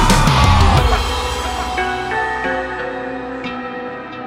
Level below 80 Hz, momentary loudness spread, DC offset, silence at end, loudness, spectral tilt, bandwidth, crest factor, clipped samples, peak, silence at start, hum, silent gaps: -22 dBFS; 13 LU; under 0.1%; 0 s; -17 LUFS; -4.5 dB/octave; 16 kHz; 16 dB; under 0.1%; 0 dBFS; 0 s; none; none